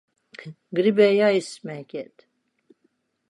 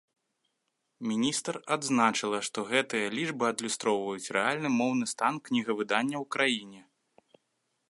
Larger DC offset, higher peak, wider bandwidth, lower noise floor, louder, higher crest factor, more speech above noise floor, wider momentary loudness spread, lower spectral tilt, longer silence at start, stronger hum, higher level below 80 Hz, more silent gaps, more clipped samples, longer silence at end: neither; first, -6 dBFS vs -10 dBFS; about the same, 11 kHz vs 11.5 kHz; second, -70 dBFS vs -80 dBFS; first, -20 LUFS vs -29 LUFS; about the same, 20 dB vs 22 dB; about the same, 48 dB vs 51 dB; first, 24 LU vs 5 LU; first, -5.5 dB/octave vs -3 dB/octave; second, 0.4 s vs 1 s; neither; about the same, -78 dBFS vs -78 dBFS; neither; neither; first, 1.25 s vs 1.1 s